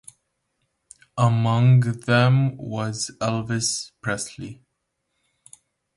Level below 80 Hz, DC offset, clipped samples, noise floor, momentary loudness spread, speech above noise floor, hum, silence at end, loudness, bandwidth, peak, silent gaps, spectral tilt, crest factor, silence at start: -58 dBFS; under 0.1%; under 0.1%; -76 dBFS; 13 LU; 56 dB; none; 1.4 s; -22 LUFS; 11.5 kHz; -6 dBFS; none; -5.5 dB/octave; 18 dB; 1.15 s